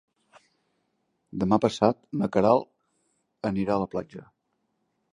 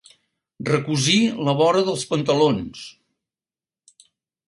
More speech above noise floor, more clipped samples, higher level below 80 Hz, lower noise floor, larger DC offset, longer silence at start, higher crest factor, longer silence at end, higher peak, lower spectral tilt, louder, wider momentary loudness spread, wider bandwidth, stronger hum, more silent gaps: second, 51 dB vs over 70 dB; neither; about the same, -58 dBFS vs -58 dBFS; second, -76 dBFS vs under -90 dBFS; neither; first, 1.35 s vs 0.6 s; first, 24 dB vs 18 dB; second, 0.9 s vs 1.6 s; about the same, -4 dBFS vs -6 dBFS; first, -7 dB/octave vs -4.5 dB/octave; second, -26 LUFS vs -20 LUFS; first, 19 LU vs 15 LU; about the same, 10.5 kHz vs 11.5 kHz; neither; neither